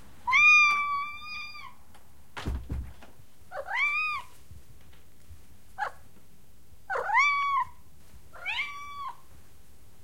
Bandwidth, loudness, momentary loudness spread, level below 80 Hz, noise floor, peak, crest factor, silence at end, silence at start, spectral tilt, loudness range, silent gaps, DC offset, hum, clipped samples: 16.5 kHz; -25 LUFS; 23 LU; -48 dBFS; -59 dBFS; -10 dBFS; 20 dB; 0.9 s; 0.25 s; -2 dB/octave; 9 LU; none; 0.7%; none; under 0.1%